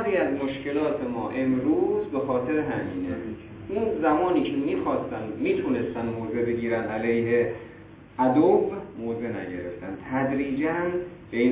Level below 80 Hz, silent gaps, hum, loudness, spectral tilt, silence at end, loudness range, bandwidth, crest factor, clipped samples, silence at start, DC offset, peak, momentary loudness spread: -54 dBFS; none; none; -26 LUFS; -11 dB/octave; 0 s; 2 LU; 4 kHz; 16 dB; under 0.1%; 0 s; under 0.1%; -10 dBFS; 10 LU